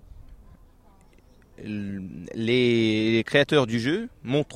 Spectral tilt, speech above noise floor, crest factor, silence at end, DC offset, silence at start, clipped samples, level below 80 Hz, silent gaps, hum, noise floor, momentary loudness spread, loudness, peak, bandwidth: -6 dB/octave; 30 dB; 18 dB; 0 s; under 0.1%; 0.15 s; under 0.1%; -54 dBFS; none; none; -54 dBFS; 15 LU; -24 LUFS; -8 dBFS; 11 kHz